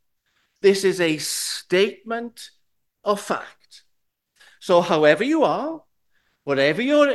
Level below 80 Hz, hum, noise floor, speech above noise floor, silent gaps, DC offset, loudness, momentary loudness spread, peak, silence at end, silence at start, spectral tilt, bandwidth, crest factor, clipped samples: -72 dBFS; none; -72 dBFS; 52 dB; none; under 0.1%; -21 LUFS; 19 LU; -2 dBFS; 0 s; 0.65 s; -4 dB/octave; 12.5 kHz; 20 dB; under 0.1%